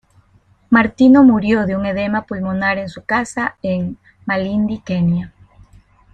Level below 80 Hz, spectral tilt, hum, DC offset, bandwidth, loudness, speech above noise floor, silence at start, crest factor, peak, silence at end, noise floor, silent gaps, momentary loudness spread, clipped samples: -46 dBFS; -7 dB/octave; none; under 0.1%; 9.2 kHz; -16 LUFS; 38 dB; 0.7 s; 16 dB; -2 dBFS; 0.85 s; -54 dBFS; none; 12 LU; under 0.1%